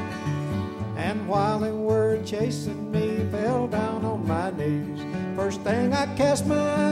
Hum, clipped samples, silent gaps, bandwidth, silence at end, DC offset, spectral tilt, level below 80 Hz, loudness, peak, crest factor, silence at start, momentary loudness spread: none; under 0.1%; none; 15 kHz; 0 s; under 0.1%; -6.5 dB/octave; -52 dBFS; -26 LUFS; -10 dBFS; 14 dB; 0 s; 7 LU